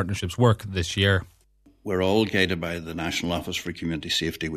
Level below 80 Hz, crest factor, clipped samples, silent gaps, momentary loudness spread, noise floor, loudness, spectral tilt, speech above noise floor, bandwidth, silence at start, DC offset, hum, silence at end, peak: -48 dBFS; 18 dB; under 0.1%; none; 9 LU; -59 dBFS; -25 LUFS; -5 dB/octave; 34 dB; 14 kHz; 0 s; under 0.1%; none; 0 s; -6 dBFS